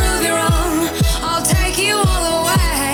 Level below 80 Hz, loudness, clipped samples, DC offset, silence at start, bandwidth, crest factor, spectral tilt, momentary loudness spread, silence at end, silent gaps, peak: -22 dBFS; -16 LUFS; under 0.1%; under 0.1%; 0 s; over 20 kHz; 10 dB; -3.5 dB/octave; 2 LU; 0 s; none; -6 dBFS